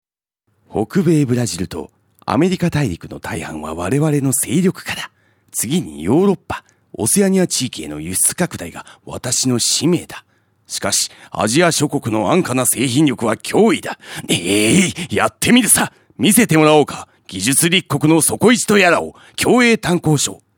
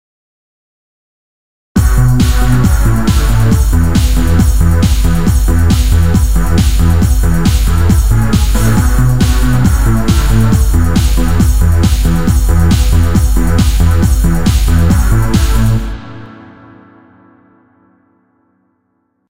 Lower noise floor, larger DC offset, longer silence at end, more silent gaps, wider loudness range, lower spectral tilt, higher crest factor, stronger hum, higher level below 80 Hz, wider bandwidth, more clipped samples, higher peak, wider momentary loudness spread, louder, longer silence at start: first, -69 dBFS vs -62 dBFS; second, under 0.1% vs 8%; first, 0.25 s vs 0 s; neither; first, 6 LU vs 3 LU; second, -4 dB/octave vs -6 dB/octave; first, 16 dB vs 10 dB; neither; second, -48 dBFS vs -12 dBFS; first, 19.5 kHz vs 16.5 kHz; neither; about the same, 0 dBFS vs 0 dBFS; first, 15 LU vs 2 LU; second, -15 LUFS vs -11 LUFS; second, 0.7 s vs 1.75 s